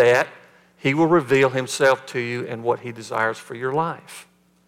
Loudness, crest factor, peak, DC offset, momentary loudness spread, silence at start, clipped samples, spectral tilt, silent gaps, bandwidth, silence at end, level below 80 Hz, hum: -21 LUFS; 16 dB; -6 dBFS; under 0.1%; 12 LU; 0 s; under 0.1%; -5 dB/octave; none; 16 kHz; 0.45 s; -68 dBFS; none